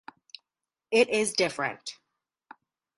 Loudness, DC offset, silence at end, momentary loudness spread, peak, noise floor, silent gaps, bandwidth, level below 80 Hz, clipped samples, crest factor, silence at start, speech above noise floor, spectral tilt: -26 LUFS; under 0.1%; 1.05 s; 25 LU; -8 dBFS; -89 dBFS; none; 11.5 kHz; -72 dBFS; under 0.1%; 22 dB; 0.9 s; 63 dB; -2.5 dB/octave